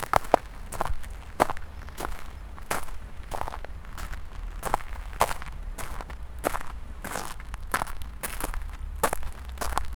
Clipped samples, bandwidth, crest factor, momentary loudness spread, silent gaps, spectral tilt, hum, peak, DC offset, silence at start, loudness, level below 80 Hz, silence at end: under 0.1%; over 20 kHz; 30 dB; 13 LU; none; -4 dB/octave; none; 0 dBFS; under 0.1%; 0 s; -33 LUFS; -38 dBFS; 0.05 s